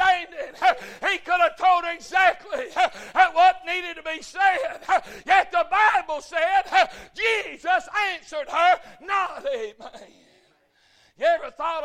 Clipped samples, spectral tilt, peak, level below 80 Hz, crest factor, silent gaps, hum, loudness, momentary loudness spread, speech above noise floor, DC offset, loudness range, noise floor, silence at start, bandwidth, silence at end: under 0.1%; -1 dB/octave; -4 dBFS; -60 dBFS; 18 dB; none; none; -22 LUFS; 10 LU; 39 dB; under 0.1%; 5 LU; -62 dBFS; 0 s; 12.5 kHz; 0 s